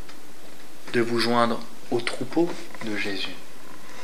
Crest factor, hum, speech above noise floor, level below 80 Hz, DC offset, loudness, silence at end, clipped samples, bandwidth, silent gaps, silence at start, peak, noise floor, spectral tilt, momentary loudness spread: 24 dB; none; 21 dB; -70 dBFS; 5%; -26 LUFS; 0 s; under 0.1%; 16 kHz; none; 0 s; -4 dBFS; -47 dBFS; -4.5 dB/octave; 23 LU